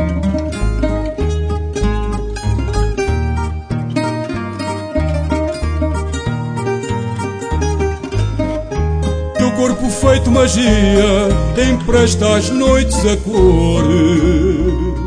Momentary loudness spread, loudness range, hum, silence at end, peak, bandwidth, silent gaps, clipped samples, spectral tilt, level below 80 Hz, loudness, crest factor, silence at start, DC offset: 9 LU; 7 LU; none; 0 s; 0 dBFS; 10.5 kHz; none; under 0.1%; -6 dB/octave; -20 dBFS; -15 LUFS; 14 dB; 0 s; under 0.1%